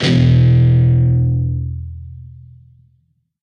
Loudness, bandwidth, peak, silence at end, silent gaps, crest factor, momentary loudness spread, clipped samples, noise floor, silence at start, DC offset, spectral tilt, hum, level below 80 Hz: -13 LUFS; 6.8 kHz; -2 dBFS; 1.15 s; none; 14 dB; 20 LU; under 0.1%; -60 dBFS; 0 s; under 0.1%; -8 dB/octave; none; -30 dBFS